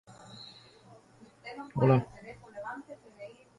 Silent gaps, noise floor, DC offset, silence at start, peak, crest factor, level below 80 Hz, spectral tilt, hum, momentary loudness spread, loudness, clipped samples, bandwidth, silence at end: none; -58 dBFS; under 0.1%; 0.1 s; -12 dBFS; 22 dB; -64 dBFS; -8.5 dB/octave; none; 24 LU; -30 LUFS; under 0.1%; 11 kHz; 0.25 s